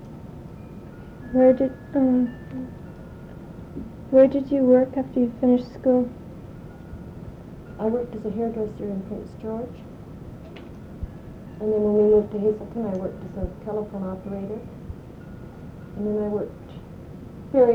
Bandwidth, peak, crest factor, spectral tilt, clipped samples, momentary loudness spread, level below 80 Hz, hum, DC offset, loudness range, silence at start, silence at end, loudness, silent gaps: 5.6 kHz; -6 dBFS; 20 dB; -10 dB/octave; under 0.1%; 22 LU; -46 dBFS; none; under 0.1%; 11 LU; 0 s; 0 s; -23 LUFS; none